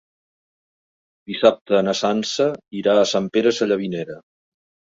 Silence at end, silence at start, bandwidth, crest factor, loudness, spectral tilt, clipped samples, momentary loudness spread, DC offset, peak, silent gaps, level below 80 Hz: 0.7 s; 1.3 s; 7.8 kHz; 20 dB; -20 LUFS; -4.5 dB/octave; under 0.1%; 12 LU; under 0.1%; -2 dBFS; 1.61-1.66 s; -64 dBFS